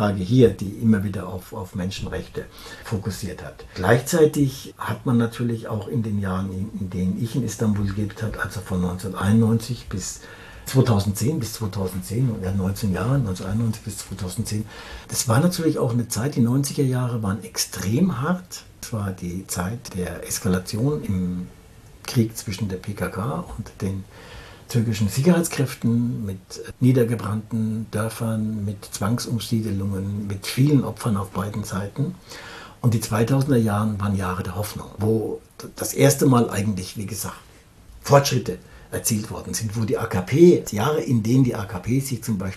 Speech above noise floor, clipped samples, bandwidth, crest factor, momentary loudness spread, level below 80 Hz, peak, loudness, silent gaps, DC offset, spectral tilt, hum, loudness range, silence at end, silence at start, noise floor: 25 dB; under 0.1%; 14 kHz; 22 dB; 13 LU; -46 dBFS; -2 dBFS; -23 LUFS; none; under 0.1%; -6 dB/octave; none; 5 LU; 0 s; 0 s; -48 dBFS